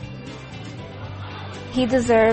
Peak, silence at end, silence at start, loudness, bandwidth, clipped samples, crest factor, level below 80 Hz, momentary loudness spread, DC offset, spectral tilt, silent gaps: -6 dBFS; 0 s; 0 s; -23 LUFS; 8.8 kHz; under 0.1%; 16 dB; -46 dBFS; 18 LU; under 0.1%; -5.5 dB/octave; none